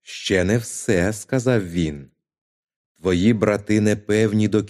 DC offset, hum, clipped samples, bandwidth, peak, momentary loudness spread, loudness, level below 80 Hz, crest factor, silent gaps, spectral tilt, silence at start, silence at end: under 0.1%; none; under 0.1%; 14.5 kHz; -2 dBFS; 7 LU; -20 LUFS; -48 dBFS; 18 dB; 2.41-2.63 s, 2.76-2.95 s; -6 dB/octave; 0.1 s; 0 s